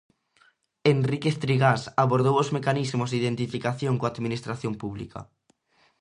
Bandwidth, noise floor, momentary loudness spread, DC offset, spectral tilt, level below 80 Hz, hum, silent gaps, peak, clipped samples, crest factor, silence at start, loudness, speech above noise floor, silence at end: 11 kHz; -65 dBFS; 11 LU; under 0.1%; -6.5 dB/octave; -60 dBFS; none; none; -6 dBFS; under 0.1%; 20 dB; 0.85 s; -25 LUFS; 40 dB; 0.8 s